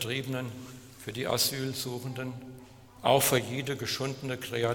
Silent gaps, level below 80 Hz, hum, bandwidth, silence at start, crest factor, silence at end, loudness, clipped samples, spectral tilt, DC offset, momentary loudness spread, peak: none; -62 dBFS; none; 19 kHz; 0 s; 22 dB; 0 s; -30 LUFS; under 0.1%; -3.5 dB/octave; under 0.1%; 20 LU; -10 dBFS